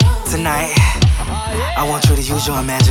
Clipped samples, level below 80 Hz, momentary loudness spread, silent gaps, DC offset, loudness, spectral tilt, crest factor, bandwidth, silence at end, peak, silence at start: under 0.1%; -20 dBFS; 6 LU; none; under 0.1%; -16 LUFS; -4.5 dB/octave; 14 dB; 18 kHz; 0 s; 0 dBFS; 0 s